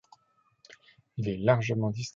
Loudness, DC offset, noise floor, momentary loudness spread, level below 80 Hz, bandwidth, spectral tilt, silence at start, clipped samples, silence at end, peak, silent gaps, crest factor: -28 LUFS; under 0.1%; -69 dBFS; 11 LU; -60 dBFS; 7.6 kHz; -6.5 dB/octave; 1.15 s; under 0.1%; 0.05 s; -10 dBFS; none; 20 dB